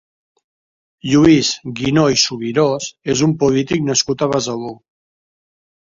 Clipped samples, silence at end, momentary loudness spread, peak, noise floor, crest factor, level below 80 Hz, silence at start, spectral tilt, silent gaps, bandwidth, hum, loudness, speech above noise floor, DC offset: under 0.1%; 1.1 s; 11 LU; 0 dBFS; under -90 dBFS; 16 dB; -48 dBFS; 1.05 s; -4.5 dB/octave; none; 7.8 kHz; none; -16 LUFS; over 74 dB; under 0.1%